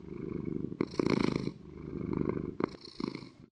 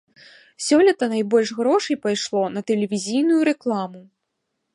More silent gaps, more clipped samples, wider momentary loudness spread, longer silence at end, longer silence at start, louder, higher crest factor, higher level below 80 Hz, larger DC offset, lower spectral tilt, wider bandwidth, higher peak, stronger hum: neither; neither; first, 11 LU vs 8 LU; second, 0.05 s vs 0.7 s; second, 0 s vs 0.6 s; second, -36 LUFS vs -20 LUFS; first, 24 dB vs 16 dB; first, -56 dBFS vs -72 dBFS; neither; first, -7.5 dB/octave vs -4.5 dB/octave; second, 10 kHz vs 11.5 kHz; second, -12 dBFS vs -6 dBFS; neither